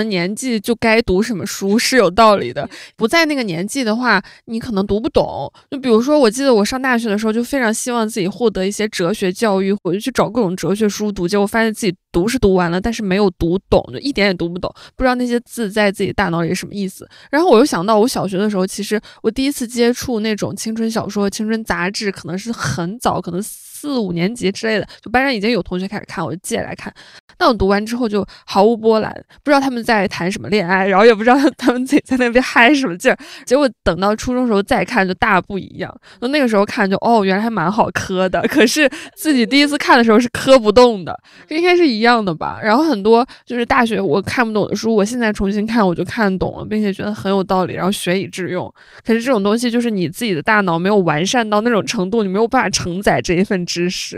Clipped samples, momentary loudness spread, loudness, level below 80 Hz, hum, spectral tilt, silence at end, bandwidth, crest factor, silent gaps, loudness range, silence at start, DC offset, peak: under 0.1%; 10 LU; -16 LUFS; -40 dBFS; none; -5 dB/octave; 0 s; 15.5 kHz; 16 dB; 27.20-27.28 s; 6 LU; 0 s; under 0.1%; 0 dBFS